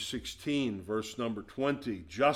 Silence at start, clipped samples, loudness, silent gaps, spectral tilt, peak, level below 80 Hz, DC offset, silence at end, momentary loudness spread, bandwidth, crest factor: 0 s; under 0.1%; -34 LUFS; none; -5 dB/octave; -14 dBFS; -60 dBFS; under 0.1%; 0 s; 5 LU; 16 kHz; 18 dB